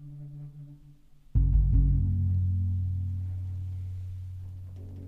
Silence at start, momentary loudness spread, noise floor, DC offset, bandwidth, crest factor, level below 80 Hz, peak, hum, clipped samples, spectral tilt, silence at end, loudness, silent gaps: 0 s; 19 LU; -53 dBFS; under 0.1%; 1 kHz; 16 dB; -32 dBFS; -14 dBFS; none; under 0.1%; -11 dB/octave; 0 s; -29 LUFS; none